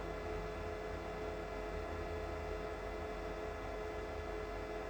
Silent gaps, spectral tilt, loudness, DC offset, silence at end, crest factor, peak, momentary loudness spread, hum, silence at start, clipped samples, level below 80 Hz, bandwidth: none; -6 dB/octave; -44 LUFS; under 0.1%; 0 s; 14 dB; -28 dBFS; 1 LU; none; 0 s; under 0.1%; -50 dBFS; over 20 kHz